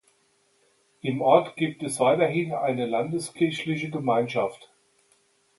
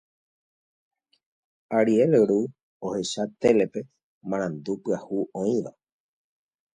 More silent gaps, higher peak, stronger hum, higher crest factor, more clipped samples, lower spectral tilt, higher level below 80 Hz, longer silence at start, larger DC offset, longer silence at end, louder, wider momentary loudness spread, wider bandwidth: second, none vs 2.63-2.80 s, 4.03-4.21 s; about the same, -6 dBFS vs -8 dBFS; neither; about the same, 22 dB vs 20 dB; neither; about the same, -5.5 dB/octave vs -6 dB/octave; about the same, -70 dBFS vs -66 dBFS; second, 1.05 s vs 1.7 s; neither; about the same, 0.95 s vs 1.05 s; about the same, -25 LUFS vs -25 LUFS; second, 9 LU vs 16 LU; first, 12 kHz vs 10.5 kHz